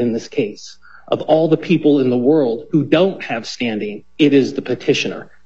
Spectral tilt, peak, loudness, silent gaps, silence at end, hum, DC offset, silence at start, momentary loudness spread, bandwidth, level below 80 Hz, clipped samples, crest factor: -6 dB/octave; 0 dBFS; -17 LUFS; none; 0.25 s; none; 0.7%; 0 s; 10 LU; 7.8 kHz; -58 dBFS; under 0.1%; 16 dB